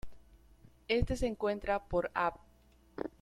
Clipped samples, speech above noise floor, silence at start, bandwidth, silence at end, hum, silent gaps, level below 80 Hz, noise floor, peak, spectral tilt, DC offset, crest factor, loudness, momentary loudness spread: under 0.1%; 31 dB; 0.05 s; 13.5 kHz; 0.1 s; none; none; -46 dBFS; -64 dBFS; -16 dBFS; -6 dB/octave; under 0.1%; 20 dB; -35 LUFS; 12 LU